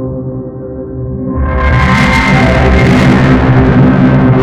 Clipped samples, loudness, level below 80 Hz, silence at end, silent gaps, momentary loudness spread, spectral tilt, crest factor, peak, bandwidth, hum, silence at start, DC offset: under 0.1%; -8 LUFS; -18 dBFS; 0 s; none; 14 LU; -7.5 dB/octave; 8 dB; 0 dBFS; 10.5 kHz; none; 0 s; under 0.1%